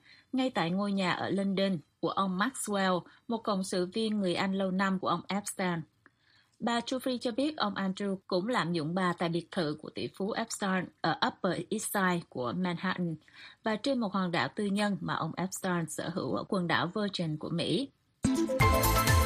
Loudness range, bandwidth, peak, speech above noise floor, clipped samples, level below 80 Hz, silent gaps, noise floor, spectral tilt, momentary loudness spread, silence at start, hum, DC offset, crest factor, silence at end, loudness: 2 LU; 15 kHz; -10 dBFS; 36 dB; under 0.1%; -48 dBFS; none; -68 dBFS; -5 dB/octave; 6 LU; 0.35 s; none; under 0.1%; 22 dB; 0 s; -32 LUFS